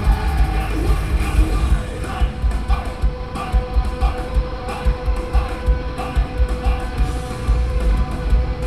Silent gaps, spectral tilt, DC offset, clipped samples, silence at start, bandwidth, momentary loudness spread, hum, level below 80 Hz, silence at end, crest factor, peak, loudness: none; -6.5 dB/octave; 1%; under 0.1%; 0 s; 12.5 kHz; 4 LU; none; -20 dBFS; 0 s; 14 dB; -4 dBFS; -22 LUFS